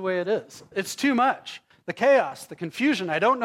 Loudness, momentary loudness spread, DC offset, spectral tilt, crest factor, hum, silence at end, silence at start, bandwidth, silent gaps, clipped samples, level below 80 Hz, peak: -24 LUFS; 15 LU; under 0.1%; -4.5 dB/octave; 14 dB; none; 0 s; 0 s; 16 kHz; none; under 0.1%; -72 dBFS; -10 dBFS